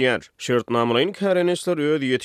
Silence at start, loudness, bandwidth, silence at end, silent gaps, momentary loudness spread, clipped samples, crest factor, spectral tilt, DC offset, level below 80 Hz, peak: 0 s; -21 LUFS; 14 kHz; 0 s; none; 4 LU; under 0.1%; 14 dB; -5 dB/octave; under 0.1%; -66 dBFS; -6 dBFS